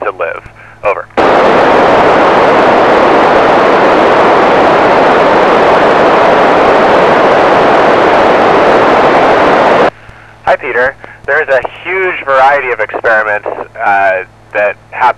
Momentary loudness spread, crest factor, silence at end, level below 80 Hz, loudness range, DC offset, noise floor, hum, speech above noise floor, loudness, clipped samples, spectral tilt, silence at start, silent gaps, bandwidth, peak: 8 LU; 8 dB; 0.05 s; -40 dBFS; 5 LU; under 0.1%; -34 dBFS; none; 24 dB; -7 LUFS; under 0.1%; -5.5 dB/octave; 0 s; none; 12 kHz; 0 dBFS